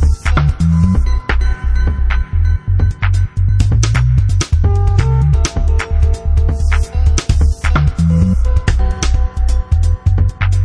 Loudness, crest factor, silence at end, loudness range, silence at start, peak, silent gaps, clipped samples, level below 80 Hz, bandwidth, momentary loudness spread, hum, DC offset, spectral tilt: -15 LUFS; 10 dB; 0 s; 1 LU; 0 s; -2 dBFS; none; under 0.1%; -14 dBFS; 10.5 kHz; 4 LU; none; under 0.1%; -6 dB/octave